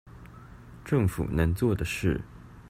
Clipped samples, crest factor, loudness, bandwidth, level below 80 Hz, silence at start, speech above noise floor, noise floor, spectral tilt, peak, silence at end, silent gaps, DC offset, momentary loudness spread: under 0.1%; 18 dB; -28 LUFS; 16 kHz; -42 dBFS; 0.05 s; 21 dB; -47 dBFS; -7 dB/octave; -12 dBFS; 0 s; none; under 0.1%; 23 LU